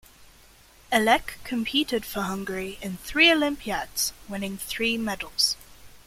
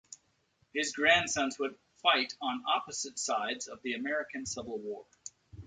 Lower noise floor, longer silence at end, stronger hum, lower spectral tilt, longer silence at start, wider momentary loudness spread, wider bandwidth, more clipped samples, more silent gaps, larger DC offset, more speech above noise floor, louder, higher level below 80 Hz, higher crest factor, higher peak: second, -54 dBFS vs -73 dBFS; about the same, 0.1 s vs 0 s; neither; about the same, -2.5 dB/octave vs -1.5 dB/octave; about the same, 0.2 s vs 0.1 s; second, 14 LU vs 18 LU; first, 16.5 kHz vs 9.6 kHz; neither; neither; neither; second, 28 dB vs 40 dB; first, -25 LUFS vs -32 LUFS; first, -50 dBFS vs -66 dBFS; about the same, 22 dB vs 22 dB; first, -6 dBFS vs -10 dBFS